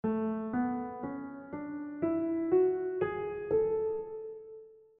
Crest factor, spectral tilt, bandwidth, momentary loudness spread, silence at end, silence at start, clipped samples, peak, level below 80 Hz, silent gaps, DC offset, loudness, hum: 16 dB; -8 dB/octave; 3.6 kHz; 15 LU; 0.25 s; 0.05 s; under 0.1%; -18 dBFS; -66 dBFS; none; under 0.1%; -33 LUFS; none